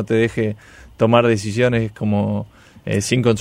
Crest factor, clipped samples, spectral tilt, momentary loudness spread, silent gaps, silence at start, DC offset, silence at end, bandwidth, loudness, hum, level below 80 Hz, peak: 18 dB; under 0.1%; -6 dB/octave; 13 LU; none; 0 s; under 0.1%; 0 s; 13.5 kHz; -19 LUFS; none; -48 dBFS; -2 dBFS